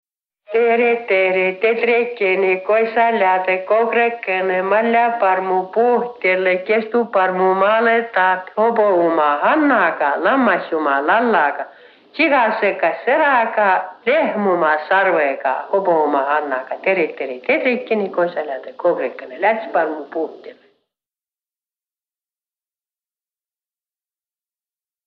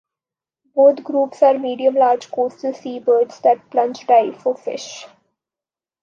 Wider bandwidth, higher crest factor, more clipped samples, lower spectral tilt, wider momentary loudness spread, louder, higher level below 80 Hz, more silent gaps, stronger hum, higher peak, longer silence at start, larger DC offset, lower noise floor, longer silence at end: second, 5.4 kHz vs 7.4 kHz; about the same, 16 dB vs 16 dB; neither; first, -8 dB/octave vs -4 dB/octave; second, 6 LU vs 12 LU; about the same, -17 LUFS vs -18 LUFS; first, -70 dBFS vs -78 dBFS; neither; neither; about the same, -2 dBFS vs -2 dBFS; second, 0.5 s vs 0.75 s; neither; about the same, under -90 dBFS vs under -90 dBFS; first, 4.55 s vs 0.95 s